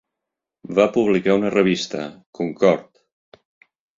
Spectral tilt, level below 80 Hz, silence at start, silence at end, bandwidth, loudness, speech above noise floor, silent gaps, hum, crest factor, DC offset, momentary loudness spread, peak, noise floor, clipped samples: -6 dB/octave; -60 dBFS; 0.65 s; 1.15 s; 7.6 kHz; -20 LUFS; 65 dB; 2.26-2.33 s; none; 20 dB; under 0.1%; 11 LU; -2 dBFS; -84 dBFS; under 0.1%